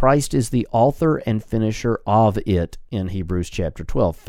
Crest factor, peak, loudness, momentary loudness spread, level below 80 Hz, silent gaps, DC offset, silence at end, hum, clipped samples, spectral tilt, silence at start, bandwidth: 18 dB; -2 dBFS; -21 LUFS; 9 LU; -34 dBFS; none; under 0.1%; 0.15 s; none; under 0.1%; -7 dB/octave; 0 s; 15.5 kHz